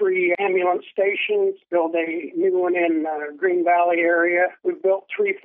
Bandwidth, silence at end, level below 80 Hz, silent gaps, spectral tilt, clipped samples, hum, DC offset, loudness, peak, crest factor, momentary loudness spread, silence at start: 3.7 kHz; 0.05 s; -86 dBFS; none; -9 dB/octave; under 0.1%; none; under 0.1%; -21 LUFS; -8 dBFS; 14 dB; 6 LU; 0 s